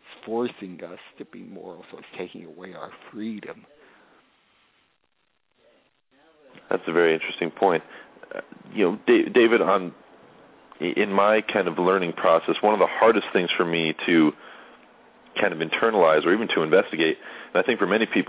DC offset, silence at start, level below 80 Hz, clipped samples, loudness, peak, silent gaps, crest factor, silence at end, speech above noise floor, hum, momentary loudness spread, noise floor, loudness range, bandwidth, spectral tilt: under 0.1%; 0.1 s; -72 dBFS; under 0.1%; -22 LUFS; -6 dBFS; none; 20 dB; 0.05 s; 50 dB; none; 22 LU; -72 dBFS; 18 LU; 4 kHz; -9 dB/octave